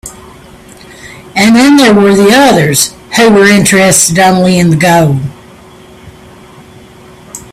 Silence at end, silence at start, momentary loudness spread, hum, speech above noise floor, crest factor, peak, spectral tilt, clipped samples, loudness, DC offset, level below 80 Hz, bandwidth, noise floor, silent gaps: 0.15 s; 0.05 s; 13 LU; none; 29 dB; 8 dB; 0 dBFS; -4 dB/octave; 0.4%; -6 LUFS; under 0.1%; -40 dBFS; over 20 kHz; -34 dBFS; none